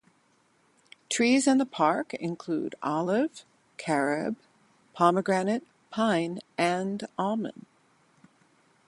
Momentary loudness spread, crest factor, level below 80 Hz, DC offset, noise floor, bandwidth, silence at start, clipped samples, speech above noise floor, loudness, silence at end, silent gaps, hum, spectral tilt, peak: 11 LU; 20 dB; -76 dBFS; under 0.1%; -67 dBFS; 11.5 kHz; 1.1 s; under 0.1%; 40 dB; -28 LUFS; 1.3 s; none; none; -4.5 dB/octave; -8 dBFS